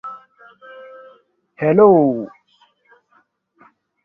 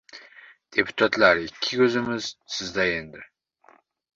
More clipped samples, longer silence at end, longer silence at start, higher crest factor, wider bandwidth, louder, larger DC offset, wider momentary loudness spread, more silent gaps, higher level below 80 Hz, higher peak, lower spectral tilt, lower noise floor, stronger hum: neither; first, 1.8 s vs 0.9 s; about the same, 0.05 s vs 0.15 s; about the same, 18 dB vs 22 dB; second, 3.4 kHz vs 7.8 kHz; first, -14 LUFS vs -23 LUFS; neither; first, 28 LU vs 15 LU; neither; second, -64 dBFS vs -58 dBFS; about the same, -2 dBFS vs -4 dBFS; first, -11.5 dB/octave vs -4 dB/octave; about the same, -60 dBFS vs -58 dBFS; neither